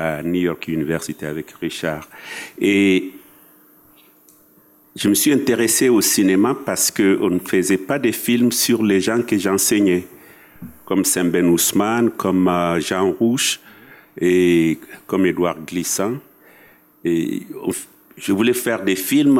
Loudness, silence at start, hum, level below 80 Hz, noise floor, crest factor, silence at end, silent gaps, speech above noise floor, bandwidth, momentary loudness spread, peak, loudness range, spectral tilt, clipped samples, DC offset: -18 LUFS; 0 s; none; -60 dBFS; -52 dBFS; 14 dB; 0 s; none; 34 dB; 17 kHz; 11 LU; -6 dBFS; 6 LU; -4 dB/octave; under 0.1%; under 0.1%